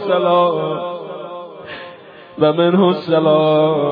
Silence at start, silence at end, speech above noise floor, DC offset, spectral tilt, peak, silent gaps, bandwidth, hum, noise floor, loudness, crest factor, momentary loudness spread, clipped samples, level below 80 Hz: 0 s; 0 s; 24 dB; under 0.1%; -10 dB/octave; -2 dBFS; none; 5.2 kHz; none; -38 dBFS; -15 LUFS; 14 dB; 19 LU; under 0.1%; -66 dBFS